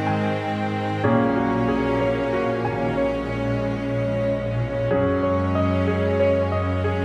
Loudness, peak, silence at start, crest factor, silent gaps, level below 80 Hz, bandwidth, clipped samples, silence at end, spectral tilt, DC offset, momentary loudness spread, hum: -22 LUFS; -6 dBFS; 0 s; 16 dB; none; -42 dBFS; 9.4 kHz; under 0.1%; 0 s; -8.5 dB/octave; under 0.1%; 5 LU; none